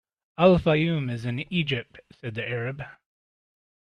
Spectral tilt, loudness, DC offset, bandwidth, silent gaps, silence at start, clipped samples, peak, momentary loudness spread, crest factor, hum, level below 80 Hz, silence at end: -8 dB/octave; -25 LUFS; under 0.1%; 9.4 kHz; none; 0.4 s; under 0.1%; -4 dBFS; 19 LU; 22 dB; none; -52 dBFS; 1.05 s